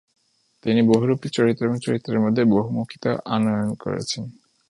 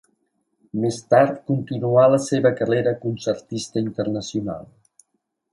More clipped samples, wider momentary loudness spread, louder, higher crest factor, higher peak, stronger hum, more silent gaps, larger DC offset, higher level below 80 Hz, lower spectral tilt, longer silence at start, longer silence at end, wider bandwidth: neither; about the same, 10 LU vs 11 LU; about the same, -22 LUFS vs -21 LUFS; about the same, 18 dB vs 18 dB; about the same, -4 dBFS vs -4 dBFS; neither; neither; neither; about the same, -58 dBFS vs -60 dBFS; about the same, -6.5 dB/octave vs -6.5 dB/octave; about the same, 0.65 s vs 0.75 s; second, 0.4 s vs 0.9 s; about the same, 11 kHz vs 11.5 kHz